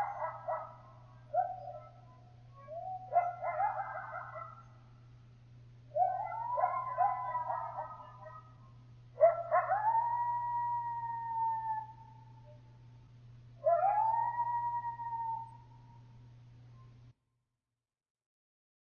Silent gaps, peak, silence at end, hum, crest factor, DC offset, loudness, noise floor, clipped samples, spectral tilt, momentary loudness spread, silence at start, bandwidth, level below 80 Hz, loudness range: none; -14 dBFS; 1.75 s; none; 22 dB; under 0.1%; -35 LUFS; under -90 dBFS; under 0.1%; -5 dB/octave; 25 LU; 0 s; 6.2 kHz; -70 dBFS; 6 LU